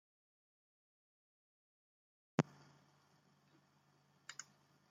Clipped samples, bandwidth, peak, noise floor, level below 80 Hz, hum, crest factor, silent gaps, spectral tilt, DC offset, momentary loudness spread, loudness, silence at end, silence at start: under 0.1%; 9.6 kHz; -16 dBFS; -74 dBFS; -90 dBFS; none; 34 dB; none; -6 dB/octave; under 0.1%; 18 LU; -44 LUFS; 2.5 s; 2.4 s